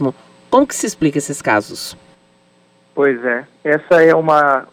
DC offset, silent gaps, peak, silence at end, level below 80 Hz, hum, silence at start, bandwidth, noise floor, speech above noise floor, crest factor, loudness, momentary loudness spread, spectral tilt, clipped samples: under 0.1%; none; 0 dBFS; 0.05 s; -54 dBFS; none; 0 s; 16.5 kHz; -53 dBFS; 39 dB; 16 dB; -15 LUFS; 14 LU; -4.5 dB/octave; under 0.1%